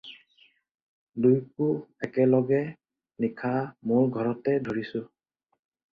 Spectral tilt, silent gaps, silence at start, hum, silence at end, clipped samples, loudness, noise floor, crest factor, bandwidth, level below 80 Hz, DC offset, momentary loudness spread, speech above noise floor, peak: -10 dB/octave; 0.71-0.75 s, 0.82-1.07 s; 0.05 s; none; 0.85 s; under 0.1%; -27 LUFS; -63 dBFS; 18 dB; 5.2 kHz; -68 dBFS; under 0.1%; 13 LU; 38 dB; -10 dBFS